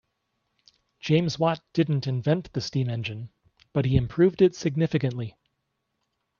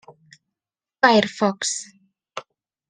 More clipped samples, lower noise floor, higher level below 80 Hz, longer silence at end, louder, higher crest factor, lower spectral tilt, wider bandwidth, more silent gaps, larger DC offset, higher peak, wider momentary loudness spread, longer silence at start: neither; second, -78 dBFS vs -90 dBFS; first, -50 dBFS vs -64 dBFS; first, 1.1 s vs 0.5 s; second, -25 LUFS vs -20 LUFS; about the same, 20 dB vs 24 dB; first, -7 dB/octave vs -3 dB/octave; second, 7.2 kHz vs 10 kHz; neither; neither; second, -8 dBFS vs 0 dBFS; second, 14 LU vs 21 LU; about the same, 1.05 s vs 1.05 s